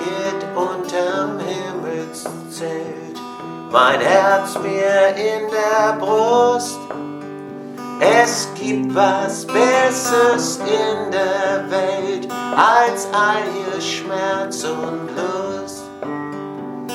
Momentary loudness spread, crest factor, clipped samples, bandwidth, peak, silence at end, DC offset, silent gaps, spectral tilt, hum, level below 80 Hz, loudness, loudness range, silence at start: 15 LU; 18 dB; under 0.1%; 16.5 kHz; 0 dBFS; 0 s; under 0.1%; none; -3.5 dB/octave; none; -66 dBFS; -18 LUFS; 7 LU; 0 s